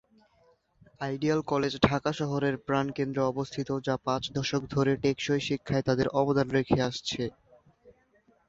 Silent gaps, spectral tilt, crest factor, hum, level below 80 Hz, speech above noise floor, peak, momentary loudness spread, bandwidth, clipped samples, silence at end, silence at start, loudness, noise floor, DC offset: none; -6 dB/octave; 24 dB; none; -56 dBFS; 38 dB; -6 dBFS; 6 LU; 7.8 kHz; under 0.1%; 0.6 s; 1 s; -29 LUFS; -66 dBFS; under 0.1%